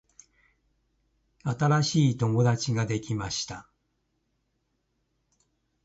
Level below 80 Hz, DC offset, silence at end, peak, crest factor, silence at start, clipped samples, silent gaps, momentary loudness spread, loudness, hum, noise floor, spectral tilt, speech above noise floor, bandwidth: -58 dBFS; under 0.1%; 2.25 s; -12 dBFS; 18 dB; 1.45 s; under 0.1%; none; 12 LU; -27 LUFS; none; -76 dBFS; -5.5 dB/octave; 50 dB; 8 kHz